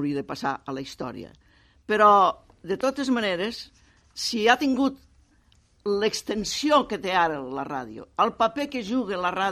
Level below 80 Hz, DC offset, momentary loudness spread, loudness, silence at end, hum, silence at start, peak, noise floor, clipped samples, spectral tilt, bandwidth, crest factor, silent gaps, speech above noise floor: -58 dBFS; under 0.1%; 15 LU; -24 LUFS; 0 s; none; 0 s; -4 dBFS; -61 dBFS; under 0.1%; -4 dB/octave; 15 kHz; 20 dB; none; 36 dB